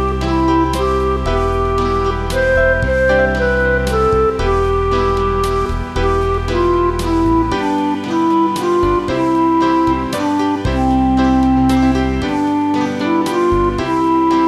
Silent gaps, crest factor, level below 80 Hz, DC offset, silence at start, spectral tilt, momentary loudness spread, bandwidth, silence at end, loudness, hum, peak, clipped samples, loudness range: none; 12 dB; -24 dBFS; under 0.1%; 0 s; -6.5 dB/octave; 4 LU; 13.5 kHz; 0 s; -15 LUFS; none; -2 dBFS; under 0.1%; 2 LU